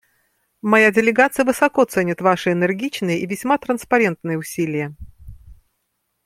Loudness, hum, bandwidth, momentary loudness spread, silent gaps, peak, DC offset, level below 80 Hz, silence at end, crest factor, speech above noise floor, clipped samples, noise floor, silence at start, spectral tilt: -18 LUFS; none; 16 kHz; 10 LU; none; -2 dBFS; under 0.1%; -50 dBFS; 0.7 s; 18 dB; 54 dB; under 0.1%; -72 dBFS; 0.65 s; -5.5 dB/octave